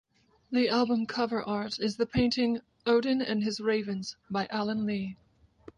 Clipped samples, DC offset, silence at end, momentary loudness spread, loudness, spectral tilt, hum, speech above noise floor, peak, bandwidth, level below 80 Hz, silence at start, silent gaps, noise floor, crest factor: under 0.1%; under 0.1%; 0.6 s; 8 LU; -30 LUFS; -5.5 dB/octave; none; 26 dB; -14 dBFS; 10.5 kHz; -58 dBFS; 0.5 s; none; -54 dBFS; 16 dB